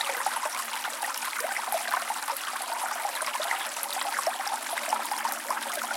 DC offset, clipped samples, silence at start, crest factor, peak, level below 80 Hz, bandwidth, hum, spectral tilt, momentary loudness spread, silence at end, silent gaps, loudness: under 0.1%; under 0.1%; 0 s; 20 dB; -12 dBFS; -90 dBFS; 17 kHz; none; 2.5 dB/octave; 3 LU; 0 s; none; -30 LUFS